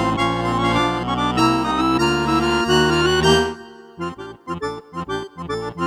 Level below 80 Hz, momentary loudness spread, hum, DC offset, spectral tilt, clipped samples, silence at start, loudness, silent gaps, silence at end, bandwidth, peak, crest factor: -38 dBFS; 15 LU; none; under 0.1%; -5 dB/octave; under 0.1%; 0 s; -19 LUFS; none; 0 s; 15 kHz; -4 dBFS; 16 dB